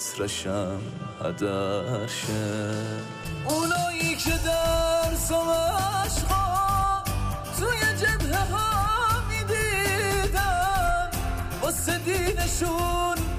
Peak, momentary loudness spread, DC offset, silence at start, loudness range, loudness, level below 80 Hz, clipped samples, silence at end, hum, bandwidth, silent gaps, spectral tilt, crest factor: -14 dBFS; 7 LU; under 0.1%; 0 s; 4 LU; -26 LUFS; -34 dBFS; under 0.1%; 0 s; none; 15.5 kHz; none; -4 dB/octave; 12 dB